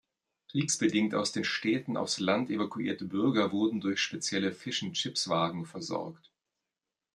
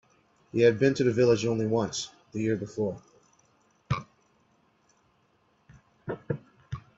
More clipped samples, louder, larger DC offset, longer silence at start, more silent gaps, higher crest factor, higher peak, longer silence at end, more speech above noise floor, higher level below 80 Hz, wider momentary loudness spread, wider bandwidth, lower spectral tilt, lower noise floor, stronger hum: neither; second, -31 LUFS vs -28 LUFS; neither; about the same, 0.5 s vs 0.55 s; neither; about the same, 20 dB vs 20 dB; about the same, -12 dBFS vs -10 dBFS; first, 1 s vs 0.2 s; first, 59 dB vs 43 dB; second, -76 dBFS vs -60 dBFS; second, 8 LU vs 17 LU; first, 12.5 kHz vs 7.8 kHz; second, -4 dB/octave vs -6 dB/octave; first, -89 dBFS vs -68 dBFS; neither